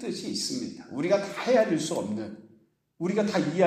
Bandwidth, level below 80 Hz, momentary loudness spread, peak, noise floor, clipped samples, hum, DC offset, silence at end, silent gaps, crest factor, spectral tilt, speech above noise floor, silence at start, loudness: 15.5 kHz; -72 dBFS; 12 LU; -10 dBFS; -62 dBFS; under 0.1%; none; under 0.1%; 0 s; none; 18 dB; -5 dB/octave; 35 dB; 0 s; -28 LUFS